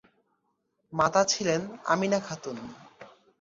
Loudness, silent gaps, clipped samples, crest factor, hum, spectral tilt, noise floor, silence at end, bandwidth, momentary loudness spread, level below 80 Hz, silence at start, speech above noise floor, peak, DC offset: -27 LUFS; none; under 0.1%; 20 dB; none; -3.5 dB/octave; -76 dBFS; 0.35 s; 7.8 kHz; 15 LU; -66 dBFS; 0.9 s; 49 dB; -10 dBFS; under 0.1%